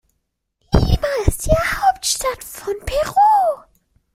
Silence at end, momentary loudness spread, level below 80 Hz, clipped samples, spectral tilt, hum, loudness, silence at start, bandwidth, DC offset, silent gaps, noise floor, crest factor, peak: 0.55 s; 12 LU; -26 dBFS; under 0.1%; -4.5 dB/octave; none; -18 LUFS; 0.7 s; 16.5 kHz; under 0.1%; none; -73 dBFS; 16 dB; -2 dBFS